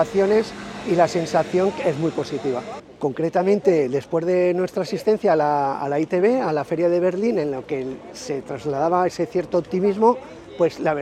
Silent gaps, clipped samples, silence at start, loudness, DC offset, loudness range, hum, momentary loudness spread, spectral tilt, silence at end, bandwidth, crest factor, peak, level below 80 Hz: none; under 0.1%; 0 s; -21 LUFS; under 0.1%; 2 LU; none; 10 LU; -6.5 dB/octave; 0 s; 13 kHz; 18 dB; -4 dBFS; -58 dBFS